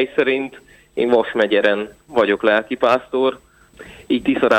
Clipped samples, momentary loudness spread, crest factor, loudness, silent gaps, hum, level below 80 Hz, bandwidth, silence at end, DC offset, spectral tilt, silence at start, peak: under 0.1%; 7 LU; 16 dB; -18 LUFS; none; none; -54 dBFS; 10 kHz; 0 s; under 0.1%; -5.5 dB/octave; 0 s; -2 dBFS